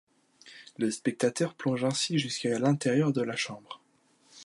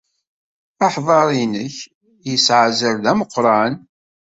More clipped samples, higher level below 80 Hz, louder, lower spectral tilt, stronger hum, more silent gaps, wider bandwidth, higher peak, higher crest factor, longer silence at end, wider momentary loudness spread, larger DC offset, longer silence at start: neither; second, -76 dBFS vs -60 dBFS; second, -29 LUFS vs -16 LUFS; about the same, -5 dB/octave vs -4 dB/octave; neither; second, none vs 1.95-2.01 s; first, 11.5 kHz vs 8 kHz; second, -12 dBFS vs -2 dBFS; about the same, 18 dB vs 16 dB; second, 0 s vs 0.55 s; about the same, 20 LU vs 18 LU; neither; second, 0.45 s vs 0.8 s